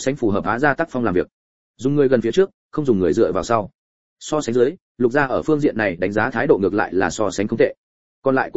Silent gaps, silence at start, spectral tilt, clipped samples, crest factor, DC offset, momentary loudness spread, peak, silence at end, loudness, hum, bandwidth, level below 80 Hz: 1.33-1.74 s, 2.54-2.69 s, 3.74-4.16 s, 4.81-4.95 s, 7.78-8.22 s; 0 s; -6 dB/octave; under 0.1%; 18 dB; 0.9%; 7 LU; -2 dBFS; 0 s; -19 LUFS; none; 8 kHz; -48 dBFS